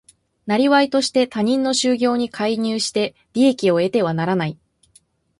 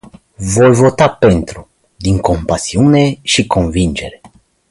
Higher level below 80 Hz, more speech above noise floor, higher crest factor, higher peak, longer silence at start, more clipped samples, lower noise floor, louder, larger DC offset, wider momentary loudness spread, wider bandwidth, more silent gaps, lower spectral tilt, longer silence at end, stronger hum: second, -62 dBFS vs -30 dBFS; first, 39 dB vs 33 dB; about the same, 16 dB vs 12 dB; about the same, -2 dBFS vs 0 dBFS; about the same, 0.45 s vs 0.4 s; neither; first, -57 dBFS vs -45 dBFS; second, -19 LUFS vs -12 LUFS; neither; second, 7 LU vs 13 LU; about the same, 11.5 kHz vs 11.5 kHz; neither; about the same, -4.5 dB/octave vs -5.5 dB/octave; first, 0.85 s vs 0.45 s; neither